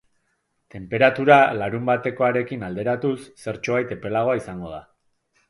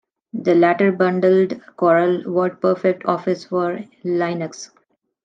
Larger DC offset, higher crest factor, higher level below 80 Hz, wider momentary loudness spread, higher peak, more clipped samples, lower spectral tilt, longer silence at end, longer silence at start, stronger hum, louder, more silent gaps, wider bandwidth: neither; first, 22 dB vs 16 dB; first, -56 dBFS vs -72 dBFS; first, 18 LU vs 12 LU; about the same, 0 dBFS vs -2 dBFS; neither; about the same, -6.5 dB/octave vs -7 dB/octave; about the same, 0.7 s vs 0.6 s; first, 0.75 s vs 0.35 s; neither; about the same, -21 LUFS vs -19 LUFS; neither; first, 11.5 kHz vs 7.6 kHz